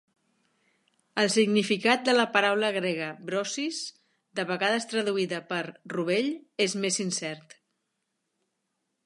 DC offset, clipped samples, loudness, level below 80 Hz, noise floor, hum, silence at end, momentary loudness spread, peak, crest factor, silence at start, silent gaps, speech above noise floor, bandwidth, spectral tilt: under 0.1%; under 0.1%; -27 LUFS; -80 dBFS; -80 dBFS; none; 1.65 s; 12 LU; -6 dBFS; 24 dB; 1.15 s; none; 53 dB; 11.5 kHz; -3.5 dB/octave